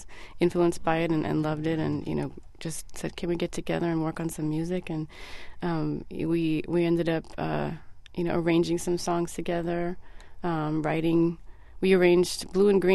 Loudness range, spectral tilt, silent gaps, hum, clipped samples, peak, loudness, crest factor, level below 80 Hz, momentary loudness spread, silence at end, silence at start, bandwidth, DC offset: 5 LU; -6 dB/octave; none; none; under 0.1%; -10 dBFS; -28 LUFS; 18 dB; -48 dBFS; 12 LU; 0 s; 0 s; 12.5 kHz; under 0.1%